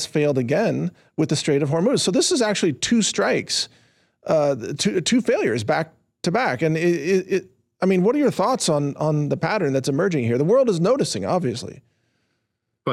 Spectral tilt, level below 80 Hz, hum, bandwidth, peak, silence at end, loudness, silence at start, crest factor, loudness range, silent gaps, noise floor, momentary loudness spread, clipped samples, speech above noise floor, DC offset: -5 dB/octave; -64 dBFS; none; 14 kHz; -10 dBFS; 0 s; -21 LUFS; 0 s; 12 dB; 2 LU; none; -76 dBFS; 8 LU; under 0.1%; 56 dB; under 0.1%